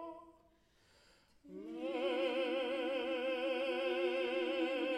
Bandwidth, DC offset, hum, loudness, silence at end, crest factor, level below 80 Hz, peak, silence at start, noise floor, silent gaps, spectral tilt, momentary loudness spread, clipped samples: 10.5 kHz; under 0.1%; none; -37 LUFS; 0 s; 14 dB; -78 dBFS; -26 dBFS; 0 s; -71 dBFS; none; -4 dB/octave; 14 LU; under 0.1%